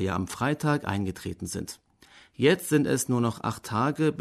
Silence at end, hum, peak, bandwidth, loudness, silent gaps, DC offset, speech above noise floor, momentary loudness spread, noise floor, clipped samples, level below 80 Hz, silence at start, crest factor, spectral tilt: 0 s; none; -10 dBFS; 13.5 kHz; -27 LUFS; none; under 0.1%; 29 dB; 11 LU; -56 dBFS; under 0.1%; -58 dBFS; 0 s; 18 dB; -5.5 dB/octave